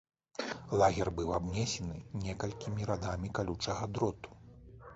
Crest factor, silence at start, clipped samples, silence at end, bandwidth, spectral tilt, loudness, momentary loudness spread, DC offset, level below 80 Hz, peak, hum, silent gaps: 22 dB; 0.4 s; under 0.1%; 0 s; 8 kHz; -5.5 dB/octave; -35 LUFS; 15 LU; under 0.1%; -52 dBFS; -14 dBFS; none; none